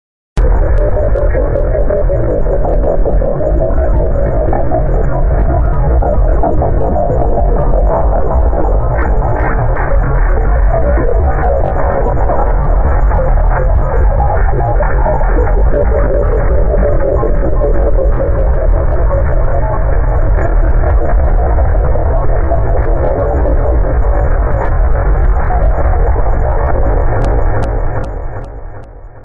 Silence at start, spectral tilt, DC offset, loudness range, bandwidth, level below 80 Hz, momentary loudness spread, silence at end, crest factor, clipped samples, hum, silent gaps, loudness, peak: 0.35 s; -11 dB/octave; under 0.1%; 1 LU; 2.6 kHz; -12 dBFS; 2 LU; 0 s; 8 dB; under 0.1%; none; none; -14 LUFS; -2 dBFS